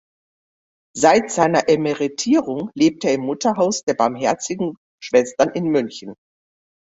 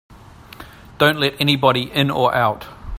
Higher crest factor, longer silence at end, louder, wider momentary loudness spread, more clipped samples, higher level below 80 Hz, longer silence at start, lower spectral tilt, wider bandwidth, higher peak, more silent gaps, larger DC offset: about the same, 18 dB vs 18 dB; first, 0.75 s vs 0 s; about the same, -19 LUFS vs -17 LUFS; first, 11 LU vs 4 LU; neither; second, -60 dBFS vs -44 dBFS; first, 0.95 s vs 0.6 s; about the same, -4.5 dB/octave vs -5.5 dB/octave; second, 8.2 kHz vs 16.5 kHz; about the same, -2 dBFS vs 0 dBFS; first, 3.83-3.87 s, 4.77-4.98 s vs none; neither